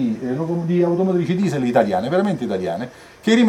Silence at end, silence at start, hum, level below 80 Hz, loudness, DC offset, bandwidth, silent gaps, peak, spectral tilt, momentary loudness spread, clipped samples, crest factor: 0 s; 0 s; none; -60 dBFS; -20 LUFS; under 0.1%; 12.5 kHz; none; -2 dBFS; -7 dB/octave; 8 LU; under 0.1%; 16 dB